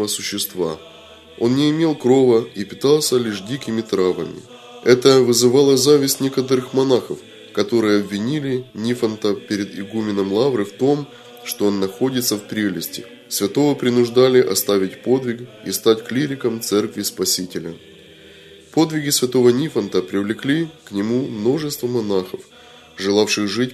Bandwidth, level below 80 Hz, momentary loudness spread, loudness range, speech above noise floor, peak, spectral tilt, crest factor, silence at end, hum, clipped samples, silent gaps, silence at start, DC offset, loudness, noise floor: 13.5 kHz; -62 dBFS; 12 LU; 6 LU; 25 dB; 0 dBFS; -4.5 dB/octave; 18 dB; 0 s; none; under 0.1%; none; 0 s; under 0.1%; -18 LUFS; -43 dBFS